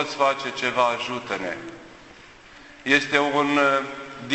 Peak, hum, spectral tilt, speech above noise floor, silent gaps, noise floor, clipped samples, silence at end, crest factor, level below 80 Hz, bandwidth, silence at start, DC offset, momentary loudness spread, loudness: -2 dBFS; none; -3.5 dB/octave; 24 dB; none; -47 dBFS; under 0.1%; 0 s; 22 dB; -62 dBFS; 8.4 kHz; 0 s; under 0.1%; 16 LU; -22 LUFS